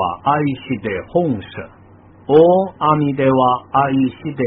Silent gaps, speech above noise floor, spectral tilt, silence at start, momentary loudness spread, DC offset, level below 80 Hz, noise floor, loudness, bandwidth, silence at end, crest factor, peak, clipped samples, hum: none; 28 dB; -6 dB/octave; 0 s; 12 LU; under 0.1%; -50 dBFS; -44 dBFS; -16 LUFS; 4 kHz; 0 s; 16 dB; 0 dBFS; under 0.1%; none